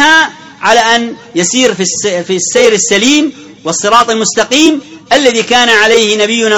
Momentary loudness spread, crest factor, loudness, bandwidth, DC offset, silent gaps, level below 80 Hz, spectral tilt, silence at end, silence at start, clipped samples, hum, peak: 9 LU; 10 dB; -9 LUFS; 20 kHz; under 0.1%; none; -48 dBFS; -2 dB/octave; 0 s; 0 s; 1%; none; 0 dBFS